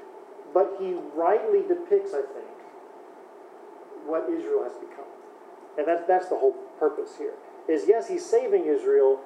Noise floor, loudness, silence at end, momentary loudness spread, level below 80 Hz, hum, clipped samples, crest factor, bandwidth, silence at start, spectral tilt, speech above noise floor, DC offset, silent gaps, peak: -47 dBFS; -26 LUFS; 0 s; 23 LU; under -90 dBFS; none; under 0.1%; 18 dB; 9.6 kHz; 0 s; -5 dB/octave; 22 dB; under 0.1%; none; -8 dBFS